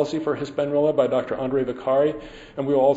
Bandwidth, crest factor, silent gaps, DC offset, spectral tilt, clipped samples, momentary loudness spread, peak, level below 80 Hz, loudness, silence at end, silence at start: 8 kHz; 16 dB; none; under 0.1%; -7 dB/octave; under 0.1%; 8 LU; -6 dBFS; -54 dBFS; -23 LUFS; 0 s; 0 s